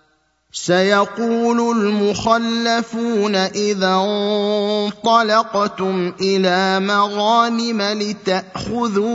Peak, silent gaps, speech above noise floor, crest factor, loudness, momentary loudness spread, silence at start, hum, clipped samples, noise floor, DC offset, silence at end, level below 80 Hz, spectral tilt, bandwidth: 0 dBFS; none; 44 dB; 18 dB; -17 LUFS; 6 LU; 0.55 s; none; under 0.1%; -61 dBFS; under 0.1%; 0 s; -54 dBFS; -4.5 dB/octave; 8 kHz